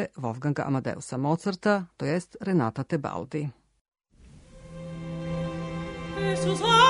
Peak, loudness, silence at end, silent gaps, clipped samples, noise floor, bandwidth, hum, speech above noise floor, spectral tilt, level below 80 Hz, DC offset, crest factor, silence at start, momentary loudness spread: -6 dBFS; -29 LUFS; 0 s; 3.81-3.92 s; under 0.1%; -53 dBFS; 11 kHz; none; 27 dB; -5.5 dB/octave; -52 dBFS; under 0.1%; 22 dB; 0 s; 10 LU